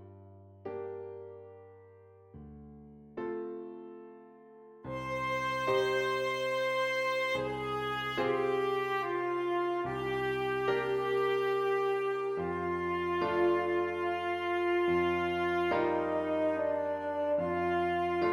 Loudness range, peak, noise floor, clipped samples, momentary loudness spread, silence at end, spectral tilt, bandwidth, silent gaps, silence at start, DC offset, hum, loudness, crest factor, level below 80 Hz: 14 LU; -18 dBFS; -57 dBFS; under 0.1%; 17 LU; 0 s; -6 dB/octave; 15.5 kHz; none; 0 s; under 0.1%; none; -32 LUFS; 14 dB; -62 dBFS